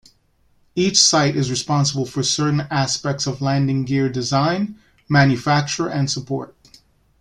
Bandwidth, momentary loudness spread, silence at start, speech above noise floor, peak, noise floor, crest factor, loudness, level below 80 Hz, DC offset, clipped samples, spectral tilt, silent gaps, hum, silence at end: 11.5 kHz; 11 LU; 0.75 s; 41 dB; 0 dBFS; -60 dBFS; 20 dB; -19 LUFS; -52 dBFS; under 0.1%; under 0.1%; -4 dB/octave; none; none; 0.75 s